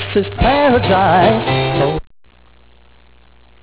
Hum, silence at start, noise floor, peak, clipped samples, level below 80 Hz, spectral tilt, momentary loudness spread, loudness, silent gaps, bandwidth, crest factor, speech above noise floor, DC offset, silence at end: 60 Hz at -40 dBFS; 0 s; -48 dBFS; -2 dBFS; under 0.1%; -32 dBFS; -10 dB/octave; 7 LU; -14 LUFS; none; 4 kHz; 14 dB; 35 dB; 0.4%; 1.6 s